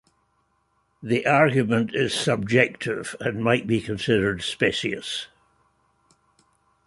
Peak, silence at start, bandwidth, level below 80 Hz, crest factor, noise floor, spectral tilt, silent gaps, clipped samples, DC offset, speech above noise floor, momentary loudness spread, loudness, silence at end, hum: -2 dBFS; 1 s; 11.5 kHz; -56 dBFS; 22 dB; -69 dBFS; -5 dB/octave; none; under 0.1%; under 0.1%; 46 dB; 10 LU; -23 LUFS; 1.6 s; none